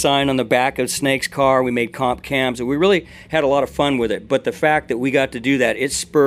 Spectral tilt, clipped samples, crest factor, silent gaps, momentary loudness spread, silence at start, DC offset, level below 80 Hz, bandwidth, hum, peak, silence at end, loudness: -4 dB/octave; under 0.1%; 16 dB; none; 4 LU; 0 s; under 0.1%; -46 dBFS; 15.5 kHz; none; -2 dBFS; 0 s; -18 LUFS